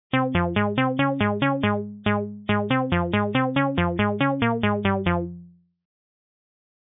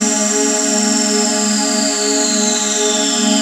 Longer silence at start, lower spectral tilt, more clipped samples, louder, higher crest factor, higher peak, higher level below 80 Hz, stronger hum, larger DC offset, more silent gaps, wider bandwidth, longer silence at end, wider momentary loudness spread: first, 0.15 s vs 0 s; first, -10.5 dB/octave vs -1.5 dB/octave; neither; second, -23 LUFS vs -13 LUFS; about the same, 16 dB vs 12 dB; second, -8 dBFS vs -2 dBFS; first, -46 dBFS vs -66 dBFS; neither; neither; neither; second, 4 kHz vs 16 kHz; first, 1.5 s vs 0 s; about the same, 3 LU vs 1 LU